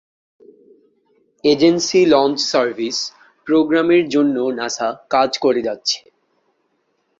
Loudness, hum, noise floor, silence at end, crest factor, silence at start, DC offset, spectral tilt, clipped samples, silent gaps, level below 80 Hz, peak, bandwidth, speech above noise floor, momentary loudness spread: -17 LUFS; none; -66 dBFS; 1.2 s; 16 dB; 1.45 s; under 0.1%; -3.5 dB/octave; under 0.1%; none; -60 dBFS; -2 dBFS; 7.8 kHz; 50 dB; 8 LU